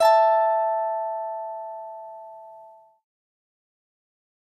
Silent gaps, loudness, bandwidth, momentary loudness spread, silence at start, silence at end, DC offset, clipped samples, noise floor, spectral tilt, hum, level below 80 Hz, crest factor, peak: none; -23 LUFS; 15 kHz; 24 LU; 0 s; 1.8 s; under 0.1%; under 0.1%; -49 dBFS; 0 dB/octave; none; -78 dBFS; 18 dB; -8 dBFS